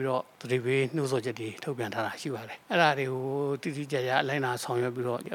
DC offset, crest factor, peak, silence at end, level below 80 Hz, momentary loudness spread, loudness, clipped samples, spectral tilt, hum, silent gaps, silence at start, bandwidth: under 0.1%; 22 dB; -8 dBFS; 0 s; -80 dBFS; 10 LU; -30 LUFS; under 0.1%; -5.5 dB/octave; none; none; 0 s; 17 kHz